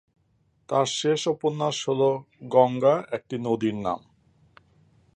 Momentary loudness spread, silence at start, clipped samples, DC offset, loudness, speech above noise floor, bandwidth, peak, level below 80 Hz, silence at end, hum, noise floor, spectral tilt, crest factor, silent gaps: 10 LU; 0.7 s; under 0.1%; under 0.1%; -25 LUFS; 43 dB; 10 kHz; -4 dBFS; -66 dBFS; 1.2 s; none; -67 dBFS; -5 dB/octave; 22 dB; none